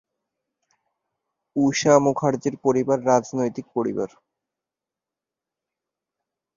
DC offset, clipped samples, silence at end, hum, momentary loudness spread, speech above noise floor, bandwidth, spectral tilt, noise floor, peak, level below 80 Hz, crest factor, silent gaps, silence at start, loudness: under 0.1%; under 0.1%; 2.5 s; none; 10 LU; 67 dB; 7.4 kHz; -5.5 dB/octave; -88 dBFS; -2 dBFS; -64 dBFS; 22 dB; none; 1.55 s; -22 LUFS